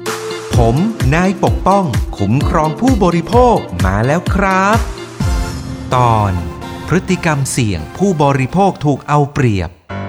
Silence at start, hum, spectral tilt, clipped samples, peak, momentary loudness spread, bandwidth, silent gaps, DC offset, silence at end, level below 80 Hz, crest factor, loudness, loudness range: 0 s; none; -6.5 dB/octave; under 0.1%; 0 dBFS; 9 LU; 16 kHz; none; under 0.1%; 0 s; -24 dBFS; 14 dB; -14 LUFS; 2 LU